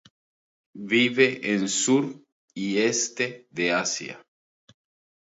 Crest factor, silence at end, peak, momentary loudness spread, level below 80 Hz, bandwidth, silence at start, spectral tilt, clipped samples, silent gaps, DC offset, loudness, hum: 20 dB; 1.05 s; -6 dBFS; 13 LU; -74 dBFS; 8 kHz; 0.75 s; -3 dB/octave; under 0.1%; 2.32-2.48 s; under 0.1%; -24 LUFS; none